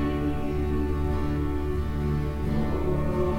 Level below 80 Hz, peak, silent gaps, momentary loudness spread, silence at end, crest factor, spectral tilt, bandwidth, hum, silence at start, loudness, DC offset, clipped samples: -30 dBFS; -14 dBFS; none; 2 LU; 0 s; 12 dB; -8.5 dB/octave; 15.5 kHz; none; 0 s; -28 LUFS; under 0.1%; under 0.1%